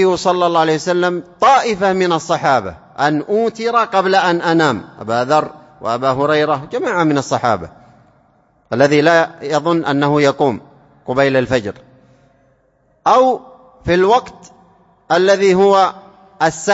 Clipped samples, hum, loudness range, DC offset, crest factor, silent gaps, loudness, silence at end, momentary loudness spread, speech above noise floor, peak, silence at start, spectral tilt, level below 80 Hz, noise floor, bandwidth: under 0.1%; none; 3 LU; under 0.1%; 14 dB; none; -15 LUFS; 0 s; 9 LU; 43 dB; 0 dBFS; 0 s; -5 dB/octave; -50 dBFS; -57 dBFS; 8 kHz